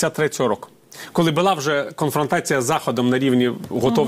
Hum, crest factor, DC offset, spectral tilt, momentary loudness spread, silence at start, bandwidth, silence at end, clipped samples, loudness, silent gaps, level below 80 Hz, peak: none; 16 dB; under 0.1%; -5 dB/octave; 6 LU; 0 s; 16 kHz; 0 s; under 0.1%; -20 LUFS; none; -56 dBFS; -4 dBFS